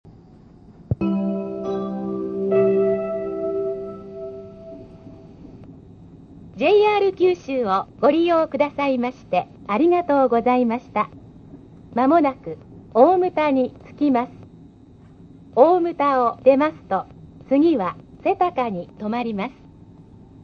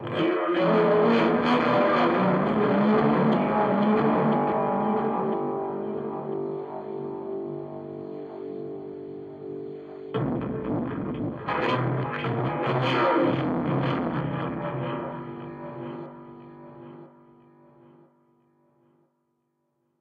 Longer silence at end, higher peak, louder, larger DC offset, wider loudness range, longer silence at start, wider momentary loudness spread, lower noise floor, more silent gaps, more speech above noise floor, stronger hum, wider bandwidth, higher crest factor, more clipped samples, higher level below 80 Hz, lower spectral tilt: second, 0.95 s vs 2.95 s; first, 0 dBFS vs -10 dBFS; first, -20 LUFS vs -25 LUFS; neither; second, 5 LU vs 14 LU; about the same, 0.05 s vs 0 s; about the same, 15 LU vs 17 LU; second, -47 dBFS vs -75 dBFS; neither; second, 28 dB vs 53 dB; neither; about the same, 6.6 kHz vs 7 kHz; about the same, 20 dB vs 16 dB; neither; about the same, -54 dBFS vs -58 dBFS; about the same, -8 dB/octave vs -8.5 dB/octave